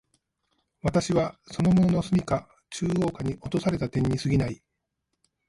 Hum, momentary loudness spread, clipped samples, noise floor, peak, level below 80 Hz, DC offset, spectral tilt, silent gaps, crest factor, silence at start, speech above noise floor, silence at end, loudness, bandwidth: none; 10 LU; under 0.1%; -80 dBFS; -10 dBFS; -48 dBFS; under 0.1%; -7 dB/octave; none; 16 dB; 0.85 s; 55 dB; 0.95 s; -26 LUFS; 11.5 kHz